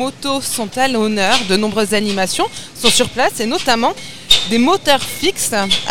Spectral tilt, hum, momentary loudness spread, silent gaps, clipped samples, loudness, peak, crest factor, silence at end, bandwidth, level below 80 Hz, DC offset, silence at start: -2.5 dB/octave; none; 7 LU; none; under 0.1%; -15 LUFS; 0 dBFS; 16 dB; 0 s; 18.5 kHz; -42 dBFS; 3%; 0 s